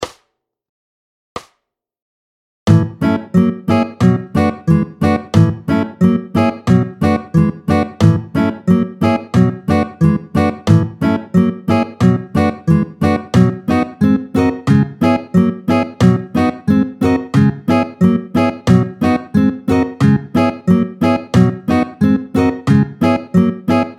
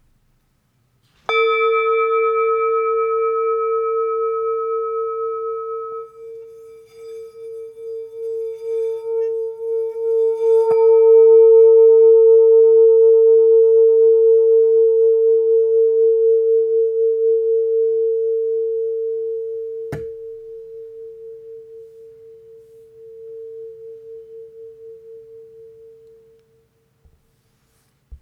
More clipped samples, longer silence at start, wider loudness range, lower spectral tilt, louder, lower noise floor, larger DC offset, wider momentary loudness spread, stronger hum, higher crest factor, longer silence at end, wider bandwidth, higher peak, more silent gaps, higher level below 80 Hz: neither; second, 0 s vs 1.3 s; second, 1 LU vs 18 LU; first, -8 dB/octave vs -5.5 dB/octave; about the same, -15 LUFS vs -15 LUFS; first, -71 dBFS vs -63 dBFS; neither; second, 4 LU vs 25 LU; neither; about the same, 14 dB vs 12 dB; about the same, 0.05 s vs 0.05 s; first, 13 kHz vs 3.7 kHz; first, 0 dBFS vs -4 dBFS; first, 0.69-1.36 s, 2.02-2.66 s vs none; first, -40 dBFS vs -60 dBFS